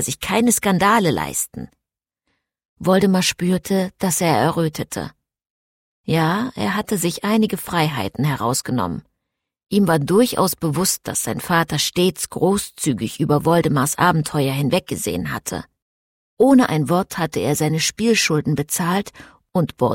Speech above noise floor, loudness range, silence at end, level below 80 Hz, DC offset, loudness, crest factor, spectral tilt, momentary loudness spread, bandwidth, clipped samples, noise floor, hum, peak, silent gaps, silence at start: 65 dB; 3 LU; 0 s; -50 dBFS; under 0.1%; -19 LUFS; 16 dB; -4.5 dB/octave; 9 LU; 16.5 kHz; under 0.1%; -83 dBFS; none; -4 dBFS; 2.65-2.76 s, 5.50-6.04 s, 15.82-16.37 s; 0 s